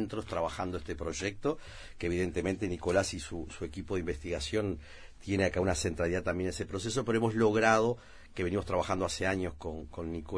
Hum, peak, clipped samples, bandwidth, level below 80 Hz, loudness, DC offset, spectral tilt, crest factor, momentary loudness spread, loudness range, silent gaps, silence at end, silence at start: none; -10 dBFS; under 0.1%; 10.5 kHz; -50 dBFS; -33 LUFS; under 0.1%; -5 dB/octave; 22 dB; 13 LU; 4 LU; none; 0 s; 0 s